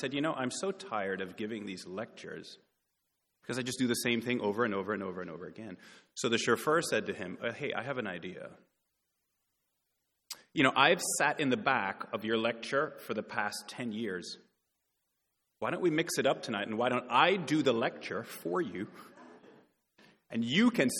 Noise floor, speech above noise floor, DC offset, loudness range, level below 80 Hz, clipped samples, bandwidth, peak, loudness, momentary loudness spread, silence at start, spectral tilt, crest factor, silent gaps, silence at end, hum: -82 dBFS; 50 dB; under 0.1%; 8 LU; -78 dBFS; under 0.1%; 19 kHz; -8 dBFS; -32 LUFS; 18 LU; 0 s; -4 dB/octave; 26 dB; none; 0 s; none